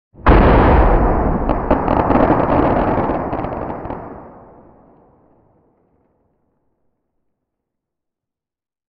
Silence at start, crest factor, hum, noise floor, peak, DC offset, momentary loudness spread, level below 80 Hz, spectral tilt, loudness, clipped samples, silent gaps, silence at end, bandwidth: 0.2 s; 16 dB; none; -88 dBFS; 0 dBFS; under 0.1%; 16 LU; -22 dBFS; -10.5 dB/octave; -15 LUFS; under 0.1%; none; 4.6 s; 5.2 kHz